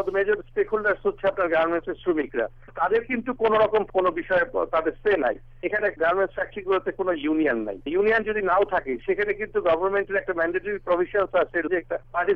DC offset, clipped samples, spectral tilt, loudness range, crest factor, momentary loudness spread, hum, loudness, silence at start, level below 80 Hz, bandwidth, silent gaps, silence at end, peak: under 0.1%; under 0.1%; -7.5 dB/octave; 1 LU; 14 dB; 6 LU; none; -24 LUFS; 0 s; -48 dBFS; 5.4 kHz; none; 0 s; -10 dBFS